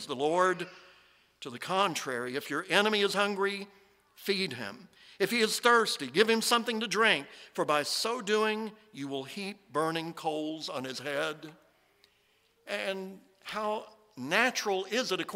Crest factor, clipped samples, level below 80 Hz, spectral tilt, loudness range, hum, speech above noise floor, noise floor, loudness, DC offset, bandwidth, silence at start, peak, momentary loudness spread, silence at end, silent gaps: 22 dB; under 0.1%; -80 dBFS; -3 dB/octave; 10 LU; none; 39 dB; -69 dBFS; -30 LUFS; under 0.1%; 16 kHz; 0 s; -8 dBFS; 15 LU; 0 s; none